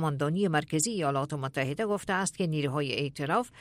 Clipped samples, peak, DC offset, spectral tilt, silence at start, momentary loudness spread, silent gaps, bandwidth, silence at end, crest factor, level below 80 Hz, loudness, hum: under 0.1%; -14 dBFS; under 0.1%; -4.5 dB/octave; 0 s; 4 LU; none; 14.5 kHz; 0 s; 16 dB; -64 dBFS; -30 LUFS; none